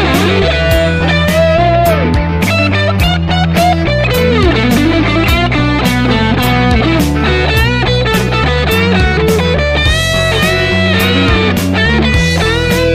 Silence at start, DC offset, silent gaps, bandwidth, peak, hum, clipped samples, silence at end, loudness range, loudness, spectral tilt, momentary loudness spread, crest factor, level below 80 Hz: 0 s; under 0.1%; none; 16 kHz; 0 dBFS; none; under 0.1%; 0 s; 0 LU; -10 LUFS; -5.5 dB/octave; 2 LU; 10 dB; -20 dBFS